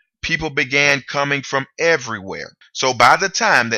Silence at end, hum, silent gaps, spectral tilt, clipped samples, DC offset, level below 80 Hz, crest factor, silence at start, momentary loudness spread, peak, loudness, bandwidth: 0 s; none; none; -2.5 dB/octave; under 0.1%; under 0.1%; -48 dBFS; 18 dB; 0.25 s; 14 LU; 0 dBFS; -16 LUFS; 16.5 kHz